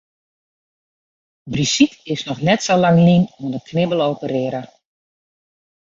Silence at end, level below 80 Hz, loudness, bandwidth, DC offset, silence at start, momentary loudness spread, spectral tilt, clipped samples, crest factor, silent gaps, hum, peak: 1.25 s; -54 dBFS; -17 LUFS; 7.6 kHz; under 0.1%; 1.45 s; 13 LU; -5.5 dB/octave; under 0.1%; 18 dB; none; none; -2 dBFS